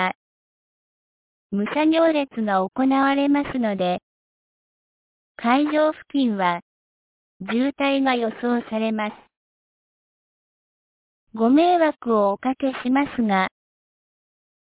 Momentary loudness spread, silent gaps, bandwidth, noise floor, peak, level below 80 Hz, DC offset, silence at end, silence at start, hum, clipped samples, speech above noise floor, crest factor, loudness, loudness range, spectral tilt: 9 LU; 0.15-1.50 s, 4.03-5.35 s, 6.62-7.40 s, 9.37-11.27 s; 4 kHz; under -90 dBFS; -6 dBFS; -62 dBFS; under 0.1%; 1.15 s; 0 s; none; under 0.1%; over 70 dB; 16 dB; -21 LUFS; 4 LU; -9.5 dB/octave